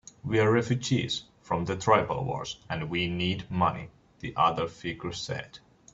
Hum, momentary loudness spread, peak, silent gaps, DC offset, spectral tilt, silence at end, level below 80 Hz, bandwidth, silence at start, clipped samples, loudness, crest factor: none; 12 LU; -8 dBFS; none; under 0.1%; -5.5 dB/octave; 0.35 s; -56 dBFS; 8 kHz; 0.25 s; under 0.1%; -29 LUFS; 22 dB